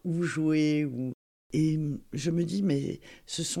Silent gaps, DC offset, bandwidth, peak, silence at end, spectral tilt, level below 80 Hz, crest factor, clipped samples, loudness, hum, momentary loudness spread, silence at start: 1.14-1.50 s; under 0.1%; 13 kHz; -16 dBFS; 0 s; -6 dB/octave; -60 dBFS; 14 dB; under 0.1%; -30 LUFS; none; 11 LU; 0.05 s